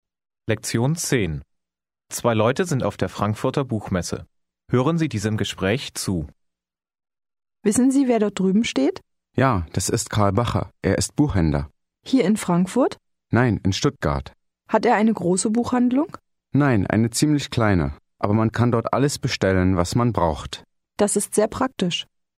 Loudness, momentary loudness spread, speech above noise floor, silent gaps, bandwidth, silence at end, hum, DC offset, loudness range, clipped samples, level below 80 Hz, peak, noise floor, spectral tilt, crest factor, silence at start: -22 LUFS; 9 LU; 67 dB; none; 16 kHz; 0.35 s; none; under 0.1%; 4 LU; under 0.1%; -42 dBFS; -2 dBFS; -88 dBFS; -5.5 dB/octave; 20 dB; 0.45 s